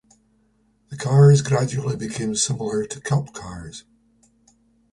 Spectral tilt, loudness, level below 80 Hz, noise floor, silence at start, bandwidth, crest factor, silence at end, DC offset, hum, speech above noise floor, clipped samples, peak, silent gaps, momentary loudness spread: -5.5 dB/octave; -20 LUFS; -52 dBFS; -63 dBFS; 0.9 s; 11.5 kHz; 18 dB; 1.1 s; under 0.1%; none; 43 dB; under 0.1%; -4 dBFS; none; 22 LU